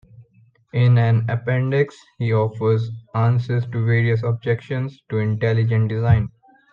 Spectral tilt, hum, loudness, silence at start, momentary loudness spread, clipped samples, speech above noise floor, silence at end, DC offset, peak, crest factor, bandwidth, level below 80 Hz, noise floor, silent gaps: -9.5 dB/octave; none; -20 LUFS; 0.2 s; 9 LU; under 0.1%; 37 dB; 0.45 s; under 0.1%; -4 dBFS; 16 dB; 5 kHz; -46 dBFS; -56 dBFS; none